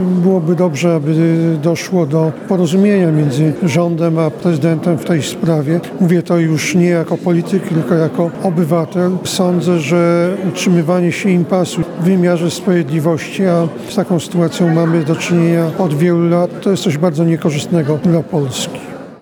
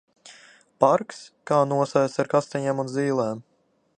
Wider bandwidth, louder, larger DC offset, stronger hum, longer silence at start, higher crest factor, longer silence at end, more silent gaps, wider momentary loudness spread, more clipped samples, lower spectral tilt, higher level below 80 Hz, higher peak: first, 18.5 kHz vs 10 kHz; first, -14 LUFS vs -23 LUFS; neither; neither; second, 0 s vs 0.25 s; second, 12 dB vs 22 dB; second, 0.05 s vs 0.55 s; neither; second, 4 LU vs 11 LU; neither; about the same, -6.5 dB/octave vs -6.5 dB/octave; first, -56 dBFS vs -72 dBFS; about the same, 0 dBFS vs -2 dBFS